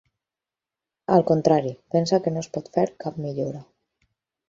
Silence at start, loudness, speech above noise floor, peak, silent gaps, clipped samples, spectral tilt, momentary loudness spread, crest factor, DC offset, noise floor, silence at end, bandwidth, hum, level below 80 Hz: 1.1 s; -23 LUFS; 67 dB; -4 dBFS; none; under 0.1%; -7 dB/octave; 12 LU; 22 dB; under 0.1%; -89 dBFS; 0.85 s; 7.6 kHz; none; -62 dBFS